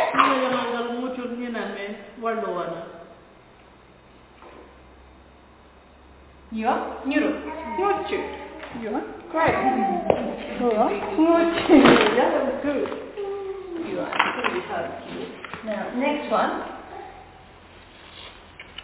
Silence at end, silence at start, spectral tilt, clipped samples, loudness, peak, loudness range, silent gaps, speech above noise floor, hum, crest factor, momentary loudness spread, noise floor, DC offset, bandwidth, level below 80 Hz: 0 s; 0 s; -9 dB/octave; under 0.1%; -23 LUFS; 0 dBFS; 14 LU; none; 28 dB; none; 24 dB; 17 LU; -50 dBFS; under 0.1%; 4 kHz; -52 dBFS